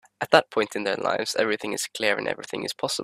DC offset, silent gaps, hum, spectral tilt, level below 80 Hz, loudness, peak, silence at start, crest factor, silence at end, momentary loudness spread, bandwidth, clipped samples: under 0.1%; none; none; -2.5 dB/octave; -68 dBFS; -25 LUFS; 0 dBFS; 0.2 s; 26 dB; 0 s; 9 LU; 15.5 kHz; under 0.1%